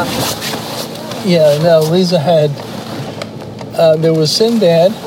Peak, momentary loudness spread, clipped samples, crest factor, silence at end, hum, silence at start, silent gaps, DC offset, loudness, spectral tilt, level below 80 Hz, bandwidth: 0 dBFS; 14 LU; under 0.1%; 12 dB; 0 s; none; 0 s; none; under 0.1%; -12 LUFS; -5.5 dB/octave; -50 dBFS; 16.5 kHz